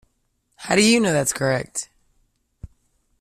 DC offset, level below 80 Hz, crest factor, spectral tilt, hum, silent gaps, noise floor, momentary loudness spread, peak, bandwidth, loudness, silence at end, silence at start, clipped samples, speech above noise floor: under 0.1%; -52 dBFS; 20 dB; -3.5 dB/octave; none; none; -69 dBFS; 19 LU; -4 dBFS; 15 kHz; -19 LUFS; 0.55 s; 0.6 s; under 0.1%; 50 dB